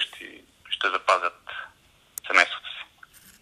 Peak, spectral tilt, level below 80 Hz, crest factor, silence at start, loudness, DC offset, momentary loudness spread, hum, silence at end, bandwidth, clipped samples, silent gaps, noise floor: 0 dBFS; 0 dB/octave; -70 dBFS; 28 dB; 0 s; -24 LUFS; under 0.1%; 22 LU; none; 0.6 s; 15 kHz; under 0.1%; none; -58 dBFS